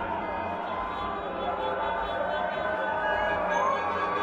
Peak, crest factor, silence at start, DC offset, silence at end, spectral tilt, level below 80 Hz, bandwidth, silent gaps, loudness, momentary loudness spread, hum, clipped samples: -14 dBFS; 14 dB; 0 s; under 0.1%; 0 s; -5 dB/octave; -52 dBFS; 8.6 kHz; none; -29 LUFS; 6 LU; none; under 0.1%